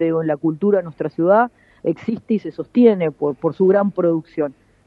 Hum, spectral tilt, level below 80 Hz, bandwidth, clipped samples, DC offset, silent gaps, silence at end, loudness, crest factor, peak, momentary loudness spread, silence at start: none; -10 dB/octave; -62 dBFS; 5.2 kHz; under 0.1%; under 0.1%; none; 0.35 s; -19 LUFS; 16 dB; -2 dBFS; 10 LU; 0 s